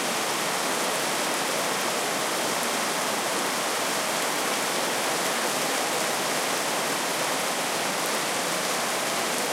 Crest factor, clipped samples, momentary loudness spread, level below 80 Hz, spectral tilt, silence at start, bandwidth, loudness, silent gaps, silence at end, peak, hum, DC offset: 16 dB; under 0.1%; 1 LU; -78 dBFS; -1 dB/octave; 0 s; 17 kHz; -25 LUFS; none; 0 s; -10 dBFS; none; under 0.1%